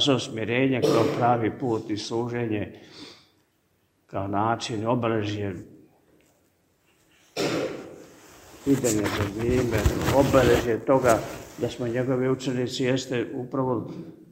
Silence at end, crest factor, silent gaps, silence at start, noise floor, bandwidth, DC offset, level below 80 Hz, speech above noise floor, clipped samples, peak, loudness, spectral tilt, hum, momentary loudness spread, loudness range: 0.05 s; 22 dB; none; 0 s; -68 dBFS; 16 kHz; under 0.1%; -44 dBFS; 44 dB; under 0.1%; -4 dBFS; -25 LUFS; -5.5 dB/octave; none; 16 LU; 8 LU